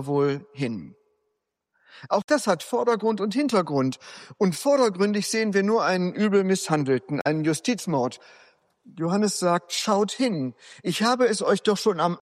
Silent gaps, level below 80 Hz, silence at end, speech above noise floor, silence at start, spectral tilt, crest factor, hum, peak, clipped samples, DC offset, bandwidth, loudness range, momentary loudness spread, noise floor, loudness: 2.24-2.28 s; -72 dBFS; 0.05 s; 55 dB; 0 s; -5 dB/octave; 16 dB; none; -8 dBFS; under 0.1%; under 0.1%; 15.5 kHz; 3 LU; 9 LU; -78 dBFS; -24 LUFS